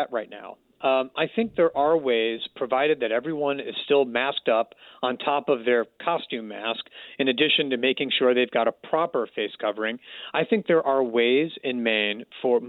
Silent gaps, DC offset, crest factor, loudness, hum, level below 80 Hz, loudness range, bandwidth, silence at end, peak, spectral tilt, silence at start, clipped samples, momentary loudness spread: none; under 0.1%; 16 dB; -24 LUFS; none; -70 dBFS; 1 LU; 4.4 kHz; 0 s; -8 dBFS; -7.5 dB/octave; 0 s; under 0.1%; 9 LU